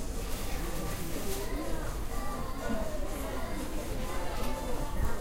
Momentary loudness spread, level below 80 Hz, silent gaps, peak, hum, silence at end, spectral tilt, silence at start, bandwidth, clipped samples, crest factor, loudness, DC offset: 2 LU; -36 dBFS; none; -18 dBFS; none; 0 s; -4.5 dB/octave; 0 s; 16 kHz; under 0.1%; 14 dB; -37 LUFS; under 0.1%